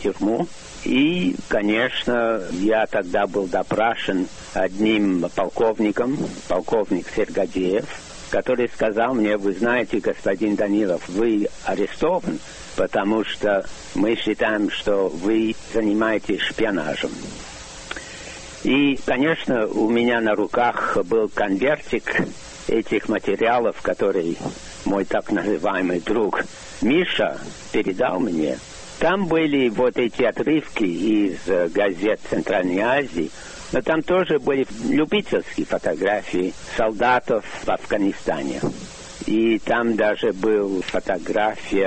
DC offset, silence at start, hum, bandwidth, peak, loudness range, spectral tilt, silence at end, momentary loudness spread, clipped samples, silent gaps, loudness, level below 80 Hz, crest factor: under 0.1%; 0 s; none; 8.8 kHz; -6 dBFS; 2 LU; -5 dB/octave; 0 s; 8 LU; under 0.1%; none; -22 LUFS; -46 dBFS; 16 dB